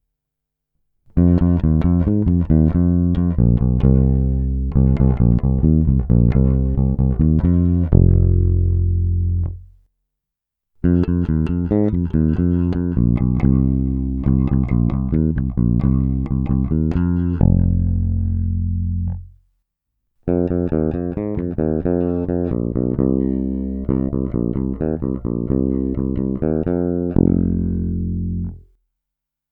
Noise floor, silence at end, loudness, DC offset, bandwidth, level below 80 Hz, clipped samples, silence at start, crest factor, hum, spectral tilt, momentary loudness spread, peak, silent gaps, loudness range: -83 dBFS; 0.9 s; -18 LUFS; under 0.1%; 3.3 kHz; -24 dBFS; under 0.1%; 1.15 s; 18 dB; none; -13 dB/octave; 7 LU; 0 dBFS; none; 5 LU